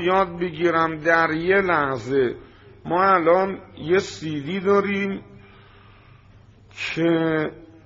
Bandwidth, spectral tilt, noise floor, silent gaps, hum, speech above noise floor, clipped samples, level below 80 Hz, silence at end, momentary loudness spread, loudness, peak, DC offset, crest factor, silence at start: 7.6 kHz; -4 dB/octave; -50 dBFS; none; none; 29 dB; under 0.1%; -54 dBFS; 0.2 s; 11 LU; -21 LUFS; -4 dBFS; under 0.1%; 20 dB; 0 s